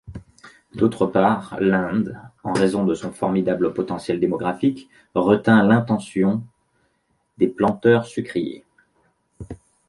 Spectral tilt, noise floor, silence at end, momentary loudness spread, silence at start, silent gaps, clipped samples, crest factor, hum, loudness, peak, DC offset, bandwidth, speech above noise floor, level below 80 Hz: -7.5 dB/octave; -68 dBFS; 0.35 s; 17 LU; 0.05 s; none; under 0.1%; 18 dB; none; -21 LUFS; -2 dBFS; under 0.1%; 11.5 kHz; 48 dB; -52 dBFS